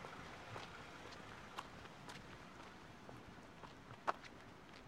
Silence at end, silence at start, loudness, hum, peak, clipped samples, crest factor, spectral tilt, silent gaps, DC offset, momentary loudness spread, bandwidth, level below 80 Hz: 0 s; 0 s; -53 LUFS; none; -22 dBFS; under 0.1%; 32 dB; -4 dB/octave; none; under 0.1%; 12 LU; 16 kHz; -72 dBFS